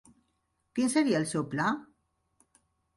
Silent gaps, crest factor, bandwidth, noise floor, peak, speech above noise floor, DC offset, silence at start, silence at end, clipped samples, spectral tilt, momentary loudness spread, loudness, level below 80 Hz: none; 18 dB; 11.5 kHz; -77 dBFS; -14 dBFS; 49 dB; under 0.1%; 0.75 s; 1.15 s; under 0.1%; -5 dB/octave; 10 LU; -29 LUFS; -70 dBFS